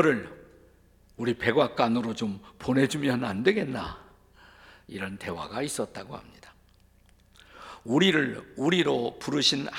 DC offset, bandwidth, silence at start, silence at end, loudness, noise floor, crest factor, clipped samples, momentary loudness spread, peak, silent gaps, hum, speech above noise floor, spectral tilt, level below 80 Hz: under 0.1%; 16.5 kHz; 0 s; 0 s; -27 LUFS; -60 dBFS; 22 dB; under 0.1%; 19 LU; -6 dBFS; none; none; 33 dB; -4.5 dB/octave; -60 dBFS